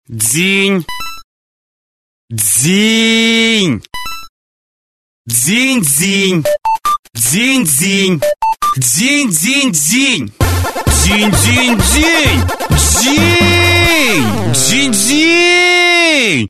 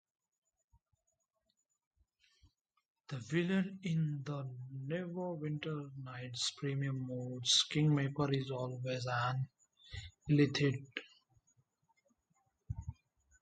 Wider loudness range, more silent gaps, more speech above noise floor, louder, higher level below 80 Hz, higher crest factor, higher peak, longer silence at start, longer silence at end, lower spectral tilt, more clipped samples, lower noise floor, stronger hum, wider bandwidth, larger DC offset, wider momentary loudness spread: about the same, 4 LU vs 6 LU; first, 1.24-2.28 s, 4.29-5.25 s, 6.99-7.03 s vs none; first, over 79 dB vs 48 dB; first, -10 LUFS vs -36 LUFS; first, -26 dBFS vs -64 dBFS; second, 12 dB vs 22 dB; first, 0 dBFS vs -16 dBFS; second, 0.1 s vs 3.1 s; second, 0 s vs 0.5 s; second, -3 dB/octave vs -5 dB/octave; neither; first, under -90 dBFS vs -84 dBFS; neither; first, 14 kHz vs 9 kHz; neither; second, 7 LU vs 17 LU